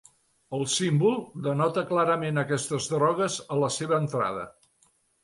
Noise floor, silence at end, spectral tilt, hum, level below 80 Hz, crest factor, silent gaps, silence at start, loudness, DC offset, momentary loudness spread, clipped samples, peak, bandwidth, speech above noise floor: -67 dBFS; 0.75 s; -5 dB/octave; none; -66 dBFS; 16 dB; none; 0.5 s; -26 LUFS; under 0.1%; 7 LU; under 0.1%; -12 dBFS; 11.5 kHz; 41 dB